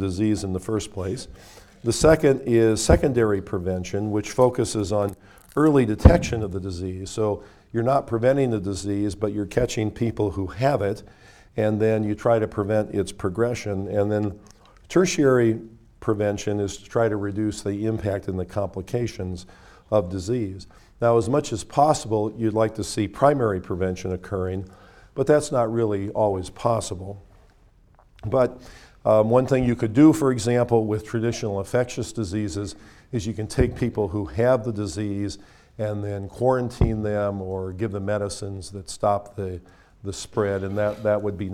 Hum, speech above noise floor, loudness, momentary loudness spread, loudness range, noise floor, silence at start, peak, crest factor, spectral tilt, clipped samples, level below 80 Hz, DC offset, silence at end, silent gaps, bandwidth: none; 32 dB; -23 LUFS; 12 LU; 6 LU; -55 dBFS; 0 s; 0 dBFS; 24 dB; -6.5 dB/octave; under 0.1%; -38 dBFS; under 0.1%; 0 s; none; 15 kHz